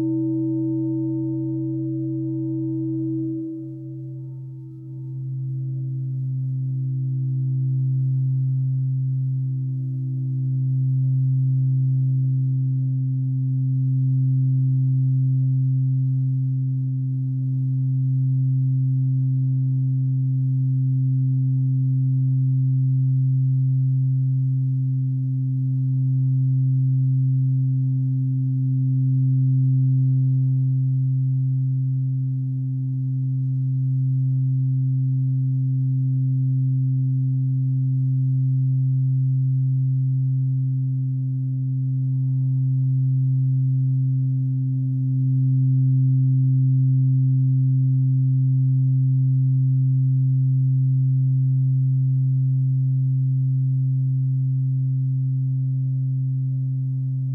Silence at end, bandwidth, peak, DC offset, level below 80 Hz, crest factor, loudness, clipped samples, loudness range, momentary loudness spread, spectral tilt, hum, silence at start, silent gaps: 0 s; 0.6 kHz; -14 dBFS; under 0.1%; -64 dBFS; 8 dB; -22 LUFS; under 0.1%; 5 LU; 6 LU; -15 dB/octave; none; 0 s; none